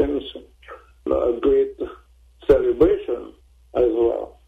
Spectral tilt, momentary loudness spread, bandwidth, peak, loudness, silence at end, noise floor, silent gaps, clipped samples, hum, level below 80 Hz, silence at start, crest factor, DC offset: -8 dB/octave; 15 LU; 4.7 kHz; -4 dBFS; -21 LUFS; 0.2 s; -50 dBFS; none; under 0.1%; none; -40 dBFS; 0 s; 18 dB; under 0.1%